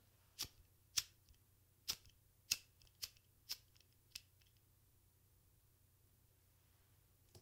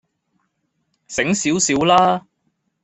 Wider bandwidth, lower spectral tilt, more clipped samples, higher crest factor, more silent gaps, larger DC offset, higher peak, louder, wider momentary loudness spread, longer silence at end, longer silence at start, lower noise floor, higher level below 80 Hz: first, 16 kHz vs 8.4 kHz; second, 1 dB/octave vs -3.5 dB/octave; neither; first, 38 dB vs 18 dB; neither; neither; second, -16 dBFS vs -2 dBFS; second, -47 LUFS vs -17 LUFS; first, 14 LU vs 11 LU; second, 0 s vs 0.65 s; second, 0.4 s vs 1.1 s; first, -74 dBFS vs -70 dBFS; second, -76 dBFS vs -56 dBFS